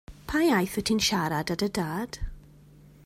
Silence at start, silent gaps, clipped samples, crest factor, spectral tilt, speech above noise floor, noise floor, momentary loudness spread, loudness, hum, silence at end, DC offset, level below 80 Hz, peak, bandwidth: 0.1 s; none; under 0.1%; 18 dB; -4 dB/octave; 26 dB; -53 dBFS; 12 LU; -27 LUFS; none; 0.65 s; under 0.1%; -46 dBFS; -10 dBFS; 16 kHz